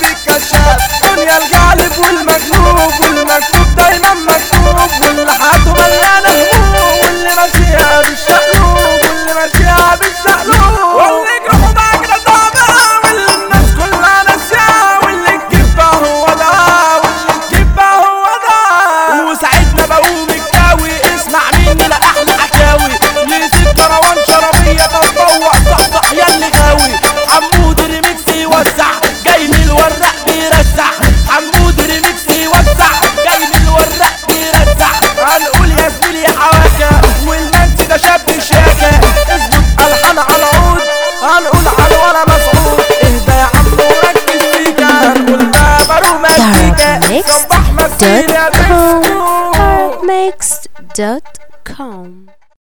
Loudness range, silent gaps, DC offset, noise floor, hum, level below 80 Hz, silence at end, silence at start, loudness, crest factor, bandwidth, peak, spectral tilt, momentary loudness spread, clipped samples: 2 LU; none; under 0.1%; -37 dBFS; none; -14 dBFS; 0.5 s; 0 s; -7 LUFS; 8 dB; over 20 kHz; 0 dBFS; -3.5 dB/octave; 4 LU; 0.9%